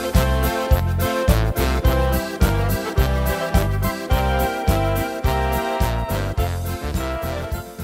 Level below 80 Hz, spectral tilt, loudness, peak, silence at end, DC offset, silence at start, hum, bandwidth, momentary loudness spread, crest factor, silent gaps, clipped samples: -24 dBFS; -6 dB/octave; -21 LUFS; -4 dBFS; 0 s; under 0.1%; 0 s; none; 16 kHz; 6 LU; 16 dB; none; under 0.1%